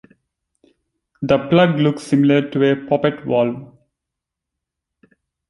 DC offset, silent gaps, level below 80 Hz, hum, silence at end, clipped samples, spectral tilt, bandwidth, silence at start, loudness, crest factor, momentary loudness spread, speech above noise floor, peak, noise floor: under 0.1%; none; -54 dBFS; none; 1.85 s; under 0.1%; -7.5 dB/octave; 11.5 kHz; 1.2 s; -17 LUFS; 18 dB; 6 LU; 66 dB; -2 dBFS; -83 dBFS